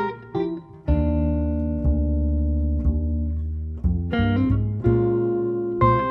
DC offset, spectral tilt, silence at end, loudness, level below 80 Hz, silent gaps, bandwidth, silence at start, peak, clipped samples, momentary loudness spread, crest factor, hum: under 0.1%; -11 dB/octave; 0 s; -23 LUFS; -26 dBFS; none; 4.3 kHz; 0 s; -4 dBFS; under 0.1%; 7 LU; 16 dB; none